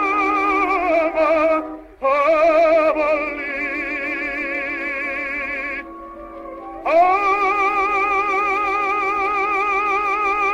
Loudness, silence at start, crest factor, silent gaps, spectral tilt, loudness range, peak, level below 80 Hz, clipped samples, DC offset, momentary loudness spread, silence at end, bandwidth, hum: -18 LUFS; 0 s; 14 dB; none; -4.5 dB/octave; 6 LU; -6 dBFS; -48 dBFS; under 0.1%; under 0.1%; 11 LU; 0 s; 9.2 kHz; none